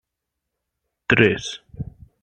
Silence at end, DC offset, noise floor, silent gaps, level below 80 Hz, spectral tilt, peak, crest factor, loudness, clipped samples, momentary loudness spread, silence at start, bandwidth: 0.4 s; under 0.1%; -82 dBFS; none; -48 dBFS; -5 dB/octave; 0 dBFS; 24 dB; -18 LUFS; under 0.1%; 20 LU; 1.1 s; 9.4 kHz